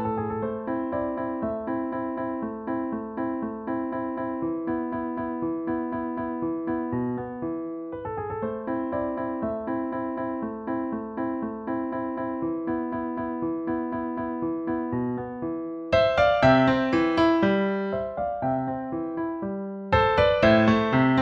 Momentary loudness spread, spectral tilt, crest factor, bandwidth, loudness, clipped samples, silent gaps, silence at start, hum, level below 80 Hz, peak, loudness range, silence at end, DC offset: 11 LU; -7.5 dB/octave; 20 dB; 7.2 kHz; -27 LUFS; under 0.1%; none; 0 s; none; -50 dBFS; -6 dBFS; 7 LU; 0 s; under 0.1%